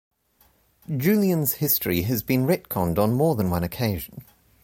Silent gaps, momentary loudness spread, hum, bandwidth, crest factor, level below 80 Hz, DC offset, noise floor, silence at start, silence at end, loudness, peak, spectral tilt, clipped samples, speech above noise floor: none; 6 LU; none; 17 kHz; 16 dB; -48 dBFS; under 0.1%; -62 dBFS; 0.9 s; 0.4 s; -23 LUFS; -8 dBFS; -6 dB/octave; under 0.1%; 39 dB